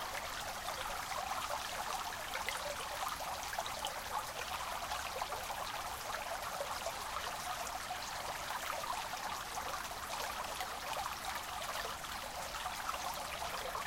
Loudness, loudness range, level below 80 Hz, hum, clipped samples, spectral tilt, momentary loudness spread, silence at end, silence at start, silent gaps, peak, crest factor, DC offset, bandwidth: -40 LUFS; 1 LU; -58 dBFS; none; under 0.1%; -1 dB/octave; 2 LU; 0 s; 0 s; none; -20 dBFS; 22 dB; under 0.1%; 17 kHz